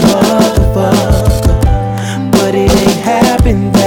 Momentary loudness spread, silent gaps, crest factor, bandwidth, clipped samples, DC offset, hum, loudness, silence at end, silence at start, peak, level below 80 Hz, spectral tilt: 3 LU; none; 8 dB; 19 kHz; under 0.1%; under 0.1%; none; -10 LUFS; 0 s; 0 s; 0 dBFS; -16 dBFS; -6 dB/octave